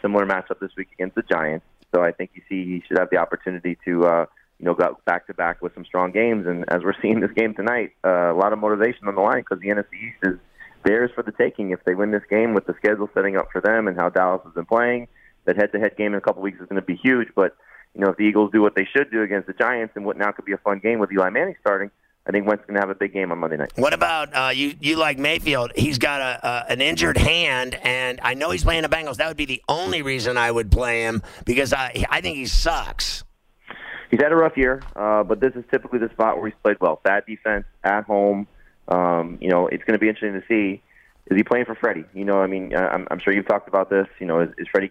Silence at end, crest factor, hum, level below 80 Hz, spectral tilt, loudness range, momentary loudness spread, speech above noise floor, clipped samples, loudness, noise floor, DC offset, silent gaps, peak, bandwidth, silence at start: 0 s; 18 dB; none; -36 dBFS; -5 dB/octave; 2 LU; 7 LU; 23 dB; under 0.1%; -21 LUFS; -44 dBFS; under 0.1%; none; -4 dBFS; 16 kHz; 0.05 s